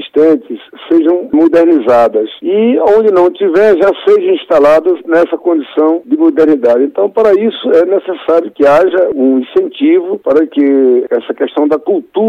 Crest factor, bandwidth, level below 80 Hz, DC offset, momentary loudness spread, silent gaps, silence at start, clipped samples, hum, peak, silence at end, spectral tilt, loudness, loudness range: 8 dB; 7.4 kHz; -52 dBFS; under 0.1%; 6 LU; none; 0 s; under 0.1%; none; -2 dBFS; 0 s; -6.5 dB/octave; -10 LUFS; 2 LU